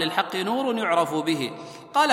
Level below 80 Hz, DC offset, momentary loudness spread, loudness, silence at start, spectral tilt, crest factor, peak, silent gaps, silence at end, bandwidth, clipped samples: -74 dBFS; under 0.1%; 7 LU; -25 LUFS; 0 s; -4 dB/octave; 20 dB; -4 dBFS; none; 0 s; 16.5 kHz; under 0.1%